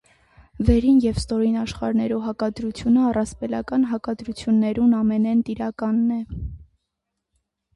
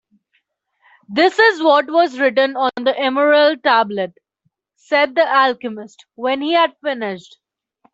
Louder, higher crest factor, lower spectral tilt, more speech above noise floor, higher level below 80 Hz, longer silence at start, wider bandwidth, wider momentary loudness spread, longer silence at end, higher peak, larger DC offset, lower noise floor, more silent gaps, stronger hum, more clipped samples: second, -22 LUFS vs -16 LUFS; about the same, 18 dB vs 16 dB; first, -7 dB/octave vs -4.5 dB/octave; first, 59 dB vs 53 dB; first, -38 dBFS vs -68 dBFS; second, 0.55 s vs 1.1 s; first, 11.5 kHz vs 8 kHz; second, 10 LU vs 13 LU; first, 1.15 s vs 0.75 s; about the same, -4 dBFS vs -2 dBFS; neither; first, -80 dBFS vs -69 dBFS; neither; neither; neither